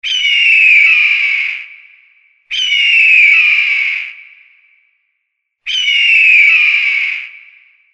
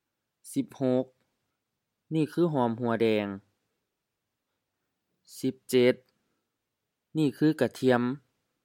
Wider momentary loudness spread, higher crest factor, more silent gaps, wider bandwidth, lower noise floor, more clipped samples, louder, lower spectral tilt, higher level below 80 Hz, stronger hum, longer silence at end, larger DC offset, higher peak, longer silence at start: first, 15 LU vs 11 LU; second, 12 dB vs 22 dB; neither; second, 8.8 kHz vs 17 kHz; second, -70 dBFS vs -84 dBFS; neither; first, -7 LUFS vs -28 LUFS; second, 5 dB/octave vs -6.5 dB/octave; first, -60 dBFS vs -78 dBFS; neither; about the same, 0.6 s vs 0.5 s; neither; first, 0 dBFS vs -8 dBFS; second, 0.05 s vs 0.45 s